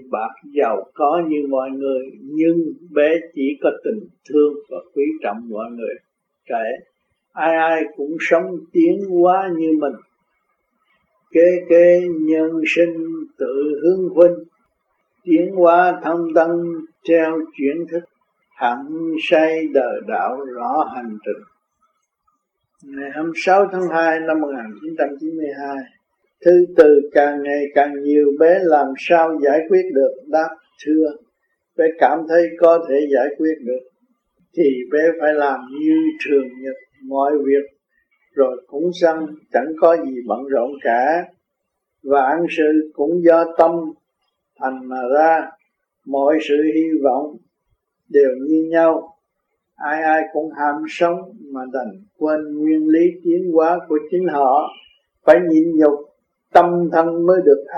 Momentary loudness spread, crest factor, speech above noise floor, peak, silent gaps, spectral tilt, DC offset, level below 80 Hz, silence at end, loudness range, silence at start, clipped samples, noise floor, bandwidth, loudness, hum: 14 LU; 18 dB; 60 dB; 0 dBFS; none; -7 dB/octave; under 0.1%; -68 dBFS; 0 s; 5 LU; 0 s; under 0.1%; -76 dBFS; 7.2 kHz; -17 LUFS; none